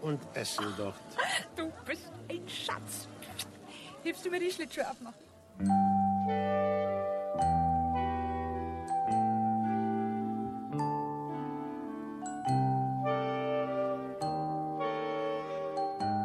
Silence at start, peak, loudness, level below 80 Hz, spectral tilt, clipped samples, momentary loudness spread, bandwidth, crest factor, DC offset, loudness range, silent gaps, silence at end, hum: 0 s; -18 dBFS; -33 LUFS; -56 dBFS; -5.5 dB/octave; under 0.1%; 11 LU; 13.5 kHz; 14 dB; under 0.1%; 7 LU; none; 0 s; none